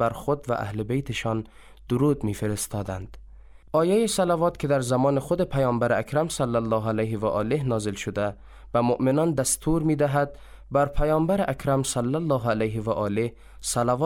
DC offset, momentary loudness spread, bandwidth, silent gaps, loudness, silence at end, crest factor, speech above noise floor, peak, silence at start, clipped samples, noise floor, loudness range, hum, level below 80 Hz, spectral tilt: under 0.1%; 7 LU; 17 kHz; none; -25 LUFS; 0 s; 14 dB; 22 dB; -10 dBFS; 0 s; under 0.1%; -47 dBFS; 3 LU; none; -42 dBFS; -5.5 dB/octave